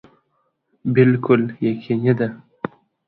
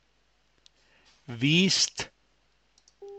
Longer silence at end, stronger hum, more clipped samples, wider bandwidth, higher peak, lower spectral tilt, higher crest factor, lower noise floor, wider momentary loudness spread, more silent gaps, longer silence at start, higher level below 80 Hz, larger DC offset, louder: first, 0.4 s vs 0 s; neither; neither; second, 4.5 kHz vs 11.5 kHz; first, 0 dBFS vs -10 dBFS; first, -11.5 dB/octave vs -3 dB/octave; about the same, 20 dB vs 20 dB; about the same, -69 dBFS vs -70 dBFS; second, 16 LU vs 19 LU; neither; second, 0.85 s vs 1.3 s; first, -60 dBFS vs -66 dBFS; neither; first, -19 LUFS vs -24 LUFS